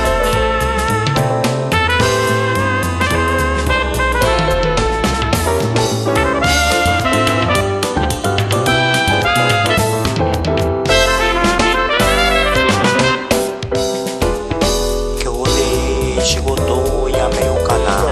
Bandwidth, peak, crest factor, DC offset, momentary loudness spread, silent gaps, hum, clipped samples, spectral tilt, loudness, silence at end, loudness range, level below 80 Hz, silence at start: 14 kHz; 0 dBFS; 14 dB; under 0.1%; 4 LU; none; none; under 0.1%; -4 dB/octave; -15 LUFS; 0 s; 3 LU; -24 dBFS; 0 s